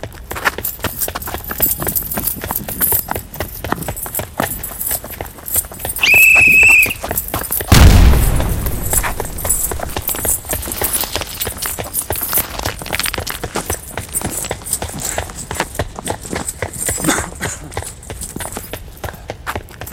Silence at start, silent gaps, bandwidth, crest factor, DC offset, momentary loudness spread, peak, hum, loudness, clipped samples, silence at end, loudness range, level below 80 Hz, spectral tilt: 0 s; none; 17.5 kHz; 16 dB; under 0.1%; 17 LU; 0 dBFS; none; -15 LUFS; 0.1%; 0 s; 12 LU; -24 dBFS; -3 dB/octave